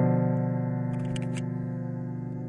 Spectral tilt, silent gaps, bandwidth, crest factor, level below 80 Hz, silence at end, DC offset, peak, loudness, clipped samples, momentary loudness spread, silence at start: -8.5 dB/octave; none; 10.5 kHz; 14 dB; -60 dBFS; 0 s; under 0.1%; -14 dBFS; -30 LUFS; under 0.1%; 8 LU; 0 s